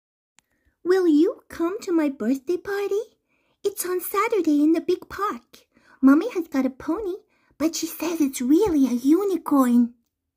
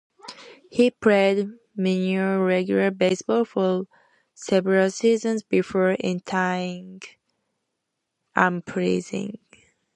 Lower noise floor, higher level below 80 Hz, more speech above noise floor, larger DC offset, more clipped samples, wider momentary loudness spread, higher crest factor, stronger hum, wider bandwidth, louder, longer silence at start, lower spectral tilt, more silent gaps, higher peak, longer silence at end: second, -48 dBFS vs -80 dBFS; first, -58 dBFS vs -66 dBFS; second, 27 dB vs 58 dB; neither; neither; second, 10 LU vs 16 LU; second, 16 dB vs 22 dB; neither; first, 16 kHz vs 10 kHz; about the same, -23 LUFS vs -23 LUFS; first, 0.85 s vs 0.25 s; second, -4.5 dB/octave vs -6 dB/octave; neither; second, -6 dBFS vs -2 dBFS; second, 0.45 s vs 0.6 s